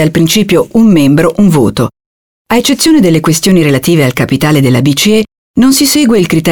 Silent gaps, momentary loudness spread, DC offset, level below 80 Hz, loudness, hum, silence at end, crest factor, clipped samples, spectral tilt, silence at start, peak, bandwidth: 2.06-2.45 s, 5.38-5.54 s; 5 LU; 1%; -36 dBFS; -8 LUFS; none; 0 s; 8 dB; under 0.1%; -5 dB/octave; 0 s; 0 dBFS; over 20 kHz